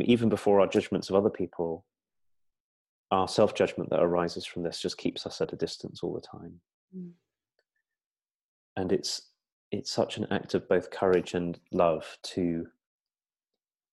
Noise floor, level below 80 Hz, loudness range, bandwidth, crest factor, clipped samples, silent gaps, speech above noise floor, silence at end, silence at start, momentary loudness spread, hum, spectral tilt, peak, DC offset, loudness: under -90 dBFS; -64 dBFS; 8 LU; 12.5 kHz; 20 dB; under 0.1%; 2.60-3.04 s, 6.74-6.88 s, 8.06-8.11 s, 8.35-8.76 s, 9.52-9.71 s; over 61 dB; 1.25 s; 0 s; 16 LU; none; -5.5 dB/octave; -10 dBFS; under 0.1%; -29 LUFS